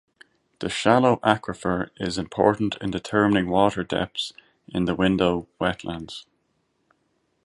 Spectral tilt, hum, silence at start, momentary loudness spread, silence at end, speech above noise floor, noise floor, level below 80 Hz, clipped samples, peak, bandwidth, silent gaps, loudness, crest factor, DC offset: -5.5 dB/octave; none; 0.6 s; 13 LU; 1.25 s; 48 dB; -71 dBFS; -50 dBFS; under 0.1%; -2 dBFS; 11.5 kHz; none; -23 LUFS; 24 dB; under 0.1%